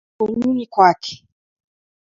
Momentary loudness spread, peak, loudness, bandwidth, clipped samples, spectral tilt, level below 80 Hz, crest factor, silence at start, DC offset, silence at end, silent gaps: 16 LU; 0 dBFS; -17 LUFS; 7.6 kHz; under 0.1%; -5.5 dB/octave; -58 dBFS; 20 dB; 0.2 s; under 0.1%; 1.05 s; none